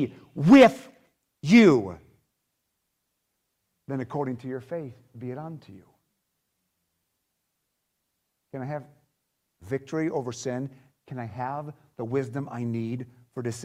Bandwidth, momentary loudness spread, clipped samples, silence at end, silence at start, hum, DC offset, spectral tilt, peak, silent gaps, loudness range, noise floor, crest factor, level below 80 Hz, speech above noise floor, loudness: 12 kHz; 23 LU; under 0.1%; 0 s; 0 s; none; under 0.1%; -6.5 dB/octave; -6 dBFS; none; 22 LU; -79 dBFS; 22 dB; -64 dBFS; 54 dB; -24 LUFS